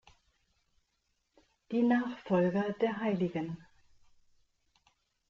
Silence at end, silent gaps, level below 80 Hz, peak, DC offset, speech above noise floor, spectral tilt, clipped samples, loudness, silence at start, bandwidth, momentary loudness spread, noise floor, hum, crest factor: 1.65 s; none; -72 dBFS; -18 dBFS; under 0.1%; 49 dB; -8.5 dB/octave; under 0.1%; -32 LUFS; 1.7 s; 7 kHz; 10 LU; -79 dBFS; none; 18 dB